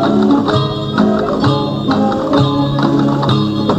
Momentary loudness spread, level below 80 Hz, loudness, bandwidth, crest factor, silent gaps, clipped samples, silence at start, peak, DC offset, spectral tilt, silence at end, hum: 3 LU; -40 dBFS; -14 LUFS; 8.8 kHz; 12 dB; none; under 0.1%; 0 s; 0 dBFS; under 0.1%; -7.5 dB/octave; 0 s; none